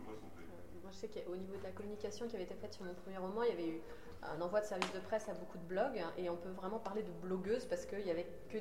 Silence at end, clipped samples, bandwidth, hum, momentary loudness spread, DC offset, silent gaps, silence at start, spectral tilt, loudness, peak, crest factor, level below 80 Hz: 0 s; under 0.1%; 16 kHz; none; 12 LU; 0.2%; none; 0 s; -5.5 dB/octave; -43 LUFS; -18 dBFS; 24 dB; -66 dBFS